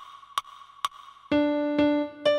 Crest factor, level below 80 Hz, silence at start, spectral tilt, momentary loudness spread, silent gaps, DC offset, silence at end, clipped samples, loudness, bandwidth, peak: 16 dB; -60 dBFS; 0 s; -4.5 dB/octave; 10 LU; none; under 0.1%; 0 s; under 0.1%; -27 LUFS; 13 kHz; -12 dBFS